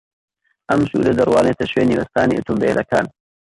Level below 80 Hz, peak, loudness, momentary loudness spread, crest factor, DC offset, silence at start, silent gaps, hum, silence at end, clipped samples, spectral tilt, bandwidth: -46 dBFS; -4 dBFS; -17 LUFS; 5 LU; 14 dB; under 0.1%; 0.7 s; none; none; 0.4 s; under 0.1%; -6.5 dB/octave; 11.5 kHz